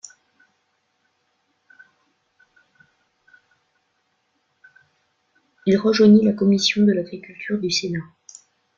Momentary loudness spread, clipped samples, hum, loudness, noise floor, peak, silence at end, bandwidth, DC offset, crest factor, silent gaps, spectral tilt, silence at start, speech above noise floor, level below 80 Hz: 20 LU; under 0.1%; none; -18 LUFS; -70 dBFS; -4 dBFS; 0.75 s; 7.6 kHz; under 0.1%; 20 dB; none; -5.5 dB/octave; 5.65 s; 52 dB; -64 dBFS